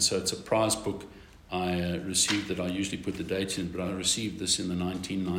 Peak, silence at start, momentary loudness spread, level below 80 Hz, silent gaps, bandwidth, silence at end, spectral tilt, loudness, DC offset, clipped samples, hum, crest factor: -12 dBFS; 0 s; 8 LU; -56 dBFS; none; 16 kHz; 0 s; -3 dB/octave; -29 LUFS; under 0.1%; under 0.1%; none; 18 dB